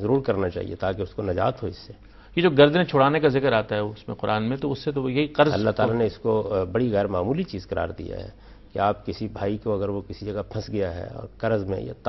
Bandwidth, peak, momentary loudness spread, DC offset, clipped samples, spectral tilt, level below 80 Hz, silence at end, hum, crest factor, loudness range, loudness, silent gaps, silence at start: 6 kHz; -4 dBFS; 13 LU; under 0.1%; under 0.1%; -8 dB/octave; -48 dBFS; 0 s; none; 20 dB; 7 LU; -24 LUFS; none; 0 s